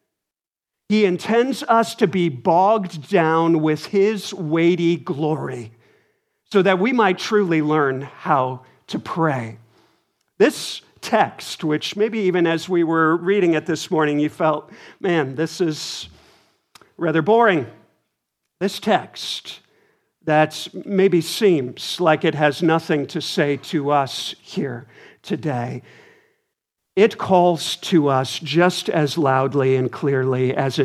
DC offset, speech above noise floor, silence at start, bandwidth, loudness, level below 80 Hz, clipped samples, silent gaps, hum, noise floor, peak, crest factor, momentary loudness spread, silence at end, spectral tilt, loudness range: under 0.1%; 69 dB; 0.9 s; 14.5 kHz; -20 LUFS; -68 dBFS; under 0.1%; none; none; -88 dBFS; -2 dBFS; 18 dB; 11 LU; 0 s; -5.5 dB/octave; 5 LU